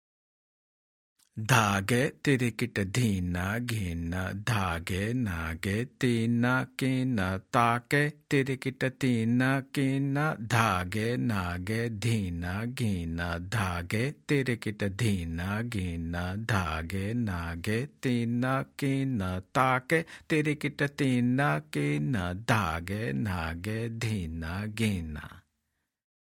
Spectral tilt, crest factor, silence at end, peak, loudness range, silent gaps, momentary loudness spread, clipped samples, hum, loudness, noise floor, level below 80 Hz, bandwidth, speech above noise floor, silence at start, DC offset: -6 dB/octave; 22 dB; 0.9 s; -6 dBFS; 3 LU; none; 7 LU; under 0.1%; none; -30 LUFS; -81 dBFS; -54 dBFS; 17 kHz; 52 dB; 1.35 s; under 0.1%